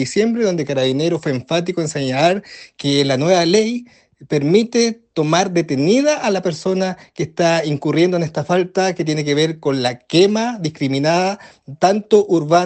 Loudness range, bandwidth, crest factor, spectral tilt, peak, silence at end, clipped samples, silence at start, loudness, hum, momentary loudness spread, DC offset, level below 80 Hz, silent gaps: 1 LU; 9 kHz; 16 dB; -5 dB/octave; 0 dBFS; 0 s; under 0.1%; 0 s; -17 LUFS; none; 8 LU; under 0.1%; -60 dBFS; none